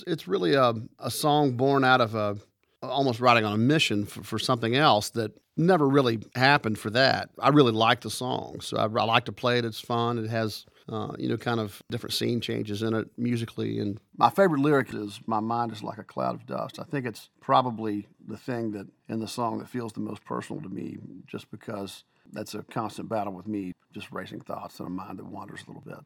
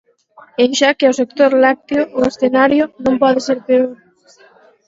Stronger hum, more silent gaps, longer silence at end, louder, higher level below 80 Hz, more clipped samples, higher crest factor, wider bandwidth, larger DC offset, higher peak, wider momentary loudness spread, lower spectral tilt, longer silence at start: neither; neither; second, 0.05 s vs 0.95 s; second, -26 LUFS vs -14 LUFS; second, -68 dBFS vs -54 dBFS; neither; first, 24 dB vs 14 dB; first, 18 kHz vs 7.8 kHz; neither; second, -4 dBFS vs 0 dBFS; first, 18 LU vs 6 LU; first, -5.5 dB/octave vs -3.5 dB/octave; second, 0 s vs 0.6 s